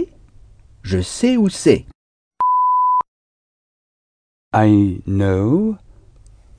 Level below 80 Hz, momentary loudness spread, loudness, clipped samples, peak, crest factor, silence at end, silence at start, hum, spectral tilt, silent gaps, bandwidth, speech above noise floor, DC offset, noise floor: -46 dBFS; 10 LU; -17 LUFS; under 0.1%; 0 dBFS; 18 dB; 0.85 s; 0 s; none; -6.5 dB/octave; 1.95-2.31 s, 3.08-4.51 s; 10 kHz; 30 dB; under 0.1%; -46 dBFS